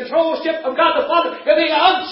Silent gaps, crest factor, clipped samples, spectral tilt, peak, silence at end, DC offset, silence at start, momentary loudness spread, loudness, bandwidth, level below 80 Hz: none; 16 dB; under 0.1%; -6.5 dB/octave; 0 dBFS; 0 s; under 0.1%; 0 s; 6 LU; -16 LUFS; 5.8 kHz; -58 dBFS